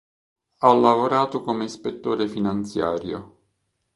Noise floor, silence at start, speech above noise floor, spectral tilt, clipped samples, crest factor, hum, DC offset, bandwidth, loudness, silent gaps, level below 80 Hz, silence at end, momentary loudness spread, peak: -73 dBFS; 0.6 s; 52 dB; -6.5 dB/octave; under 0.1%; 22 dB; none; under 0.1%; 11.5 kHz; -22 LUFS; none; -58 dBFS; 0.7 s; 13 LU; -2 dBFS